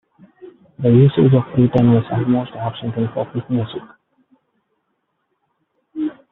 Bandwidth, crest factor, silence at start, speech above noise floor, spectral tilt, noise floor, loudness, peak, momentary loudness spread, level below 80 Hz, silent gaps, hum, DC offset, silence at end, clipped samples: 4 kHz; 16 dB; 0.45 s; 55 dB; -8.5 dB/octave; -71 dBFS; -17 LUFS; -2 dBFS; 14 LU; -52 dBFS; none; none; under 0.1%; 0.2 s; under 0.1%